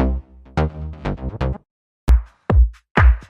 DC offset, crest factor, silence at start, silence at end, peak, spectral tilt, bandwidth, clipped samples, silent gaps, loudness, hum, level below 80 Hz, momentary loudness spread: under 0.1%; 16 dB; 0 s; 0.1 s; -2 dBFS; -8 dB/octave; 5.6 kHz; under 0.1%; 1.71-2.07 s, 2.91-2.95 s; -21 LUFS; none; -20 dBFS; 12 LU